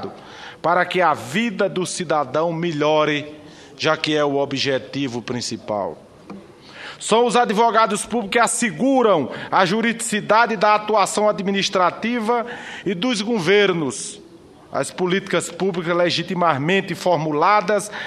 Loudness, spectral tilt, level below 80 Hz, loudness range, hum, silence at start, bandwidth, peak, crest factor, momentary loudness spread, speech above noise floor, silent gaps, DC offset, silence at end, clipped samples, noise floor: -19 LUFS; -4 dB/octave; -62 dBFS; 5 LU; none; 0 s; 13.5 kHz; 0 dBFS; 20 dB; 12 LU; 25 dB; none; under 0.1%; 0 s; under 0.1%; -45 dBFS